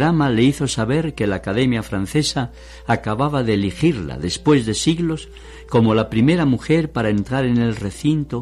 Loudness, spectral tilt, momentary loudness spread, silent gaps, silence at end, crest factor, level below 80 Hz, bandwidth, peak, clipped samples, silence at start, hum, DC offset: -19 LUFS; -6 dB/octave; 6 LU; none; 0 s; 16 dB; -40 dBFS; 13.5 kHz; -4 dBFS; under 0.1%; 0 s; none; under 0.1%